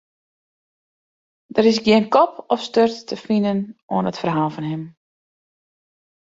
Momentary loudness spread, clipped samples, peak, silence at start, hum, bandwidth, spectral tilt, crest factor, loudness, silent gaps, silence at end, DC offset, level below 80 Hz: 13 LU; under 0.1%; -2 dBFS; 1.55 s; none; 7.8 kHz; -6 dB/octave; 20 dB; -19 LUFS; 3.82-3.88 s; 1.4 s; under 0.1%; -60 dBFS